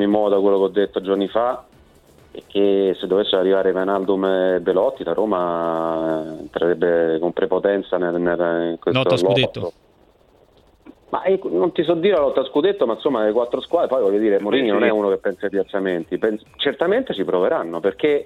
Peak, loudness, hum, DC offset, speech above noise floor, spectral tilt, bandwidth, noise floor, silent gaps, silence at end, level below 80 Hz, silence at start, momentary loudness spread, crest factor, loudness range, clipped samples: -4 dBFS; -19 LUFS; none; under 0.1%; 35 dB; -7 dB/octave; 10 kHz; -54 dBFS; none; 0 s; -56 dBFS; 0 s; 6 LU; 16 dB; 3 LU; under 0.1%